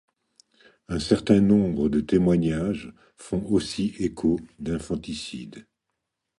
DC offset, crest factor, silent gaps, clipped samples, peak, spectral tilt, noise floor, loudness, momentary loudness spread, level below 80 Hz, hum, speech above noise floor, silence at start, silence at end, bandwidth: under 0.1%; 20 dB; none; under 0.1%; -6 dBFS; -7 dB/octave; -82 dBFS; -24 LUFS; 14 LU; -46 dBFS; none; 58 dB; 0.9 s; 0.75 s; 11.5 kHz